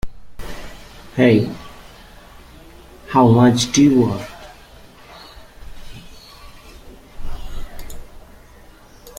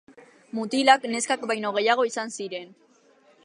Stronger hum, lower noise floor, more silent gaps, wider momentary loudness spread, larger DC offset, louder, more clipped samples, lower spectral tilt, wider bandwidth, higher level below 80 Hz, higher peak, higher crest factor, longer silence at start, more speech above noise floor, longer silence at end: neither; second, -44 dBFS vs -59 dBFS; neither; first, 27 LU vs 15 LU; neither; first, -15 LUFS vs -24 LUFS; neither; first, -6 dB/octave vs -2.5 dB/octave; first, 16 kHz vs 11 kHz; first, -36 dBFS vs -84 dBFS; about the same, -2 dBFS vs -2 dBFS; second, 18 dB vs 24 dB; second, 0.05 s vs 0.55 s; second, 31 dB vs 35 dB; second, 0 s vs 0.8 s